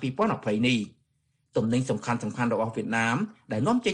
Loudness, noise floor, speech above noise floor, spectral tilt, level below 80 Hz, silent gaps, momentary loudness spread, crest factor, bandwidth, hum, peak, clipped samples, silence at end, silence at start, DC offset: -27 LUFS; -73 dBFS; 46 dB; -5.5 dB/octave; -62 dBFS; none; 5 LU; 16 dB; 10.5 kHz; none; -12 dBFS; under 0.1%; 0 s; 0 s; under 0.1%